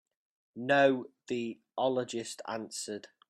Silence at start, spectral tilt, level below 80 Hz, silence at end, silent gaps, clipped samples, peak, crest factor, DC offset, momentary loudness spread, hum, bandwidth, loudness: 0.55 s; -4 dB/octave; -80 dBFS; 0.25 s; none; under 0.1%; -12 dBFS; 22 dB; under 0.1%; 14 LU; none; 12.5 kHz; -32 LUFS